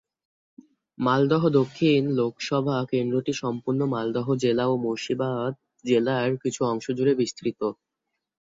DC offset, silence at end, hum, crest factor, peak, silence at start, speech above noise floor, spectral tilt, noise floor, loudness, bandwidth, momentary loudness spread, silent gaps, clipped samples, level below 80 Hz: under 0.1%; 0.85 s; none; 18 dB; -8 dBFS; 1 s; 58 dB; -6.5 dB/octave; -82 dBFS; -25 LUFS; 7.8 kHz; 7 LU; none; under 0.1%; -66 dBFS